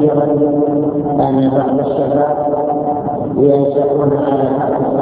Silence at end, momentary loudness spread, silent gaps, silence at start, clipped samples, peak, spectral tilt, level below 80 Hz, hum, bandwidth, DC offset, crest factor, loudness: 0 s; 4 LU; none; 0 s; under 0.1%; 0 dBFS; -12.5 dB/octave; -46 dBFS; none; 4 kHz; under 0.1%; 14 dB; -14 LUFS